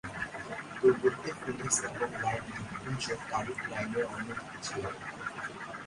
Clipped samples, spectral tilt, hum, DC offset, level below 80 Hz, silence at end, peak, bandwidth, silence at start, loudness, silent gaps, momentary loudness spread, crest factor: under 0.1%; -3.5 dB/octave; none; under 0.1%; -60 dBFS; 0 s; -12 dBFS; 11.5 kHz; 0.05 s; -34 LUFS; none; 11 LU; 22 dB